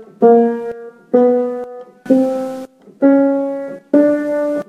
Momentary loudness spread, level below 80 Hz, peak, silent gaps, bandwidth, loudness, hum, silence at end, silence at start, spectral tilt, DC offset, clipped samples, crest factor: 16 LU; -70 dBFS; 0 dBFS; none; 9 kHz; -15 LUFS; none; 0.05 s; 0 s; -8 dB/octave; under 0.1%; under 0.1%; 14 dB